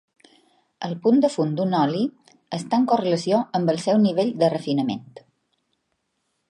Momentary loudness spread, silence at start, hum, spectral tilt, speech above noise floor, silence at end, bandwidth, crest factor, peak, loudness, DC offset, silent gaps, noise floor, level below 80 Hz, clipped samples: 12 LU; 0.8 s; none; -6.5 dB/octave; 53 dB; 1.5 s; 11.5 kHz; 18 dB; -6 dBFS; -22 LUFS; under 0.1%; none; -74 dBFS; -72 dBFS; under 0.1%